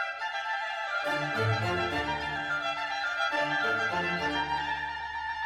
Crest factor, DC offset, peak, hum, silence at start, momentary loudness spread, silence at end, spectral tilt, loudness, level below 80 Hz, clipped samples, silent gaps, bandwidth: 14 dB; under 0.1%; -16 dBFS; none; 0 s; 5 LU; 0 s; -4.5 dB/octave; -30 LUFS; -56 dBFS; under 0.1%; none; 15 kHz